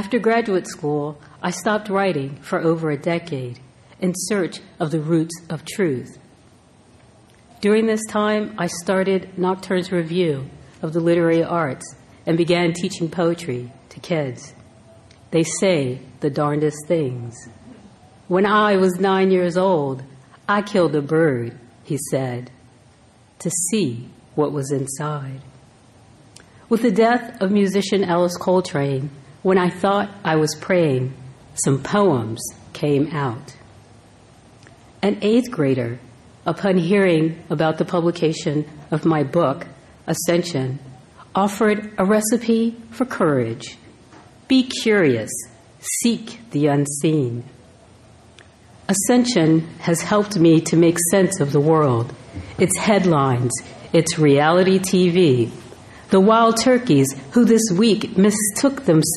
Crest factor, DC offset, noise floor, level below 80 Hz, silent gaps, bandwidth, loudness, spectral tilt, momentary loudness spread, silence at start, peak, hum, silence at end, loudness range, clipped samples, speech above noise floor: 16 dB; under 0.1%; -51 dBFS; -56 dBFS; none; 13.5 kHz; -19 LUFS; -5.5 dB/octave; 13 LU; 0 s; -2 dBFS; none; 0 s; 7 LU; under 0.1%; 33 dB